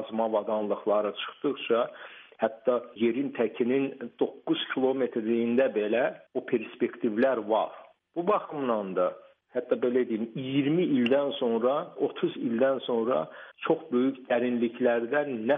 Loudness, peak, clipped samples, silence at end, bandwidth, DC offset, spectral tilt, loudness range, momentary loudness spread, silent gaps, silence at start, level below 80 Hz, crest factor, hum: -28 LUFS; -12 dBFS; under 0.1%; 0 s; 4 kHz; under 0.1%; -4 dB/octave; 2 LU; 7 LU; none; 0 s; -80 dBFS; 16 dB; none